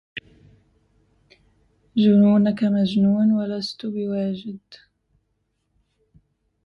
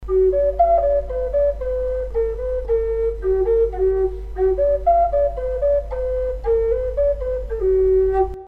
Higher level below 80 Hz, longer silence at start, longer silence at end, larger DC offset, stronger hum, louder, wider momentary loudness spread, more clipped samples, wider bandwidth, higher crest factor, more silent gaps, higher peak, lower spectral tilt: second, -62 dBFS vs -30 dBFS; first, 0.15 s vs 0 s; first, 1.9 s vs 0 s; neither; neither; about the same, -20 LUFS vs -20 LUFS; first, 21 LU vs 7 LU; neither; first, 6.6 kHz vs 4.2 kHz; about the same, 16 dB vs 12 dB; neither; about the same, -6 dBFS vs -6 dBFS; second, -8.5 dB/octave vs -10 dB/octave